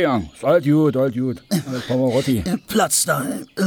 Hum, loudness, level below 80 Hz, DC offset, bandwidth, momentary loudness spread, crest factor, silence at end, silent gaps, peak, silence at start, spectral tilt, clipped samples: none; -19 LUFS; -48 dBFS; under 0.1%; over 20 kHz; 7 LU; 14 dB; 0 s; none; -6 dBFS; 0 s; -5 dB/octave; under 0.1%